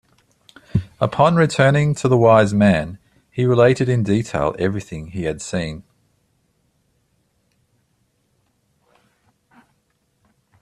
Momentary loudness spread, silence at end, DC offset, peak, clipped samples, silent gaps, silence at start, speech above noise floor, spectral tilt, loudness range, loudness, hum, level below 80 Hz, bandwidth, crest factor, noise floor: 15 LU; 4.8 s; under 0.1%; -2 dBFS; under 0.1%; none; 0.75 s; 50 dB; -7 dB/octave; 15 LU; -18 LUFS; none; -48 dBFS; 11.5 kHz; 18 dB; -66 dBFS